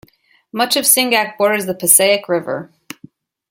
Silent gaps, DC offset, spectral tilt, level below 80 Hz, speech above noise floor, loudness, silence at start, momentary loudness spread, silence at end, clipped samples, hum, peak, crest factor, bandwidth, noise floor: none; under 0.1%; -1.5 dB/octave; -66 dBFS; 36 dB; -13 LUFS; 0.55 s; 16 LU; 0.85 s; under 0.1%; none; 0 dBFS; 18 dB; 17 kHz; -51 dBFS